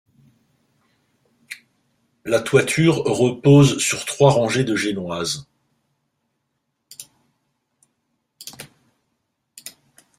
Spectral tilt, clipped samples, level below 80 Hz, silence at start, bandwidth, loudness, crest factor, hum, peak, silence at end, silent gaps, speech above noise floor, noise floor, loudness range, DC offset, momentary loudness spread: -5 dB/octave; under 0.1%; -56 dBFS; 1.5 s; 15.5 kHz; -18 LUFS; 20 dB; none; -2 dBFS; 0.5 s; none; 57 dB; -74 dBFS; 13 LU; under 0.1%; 26 LU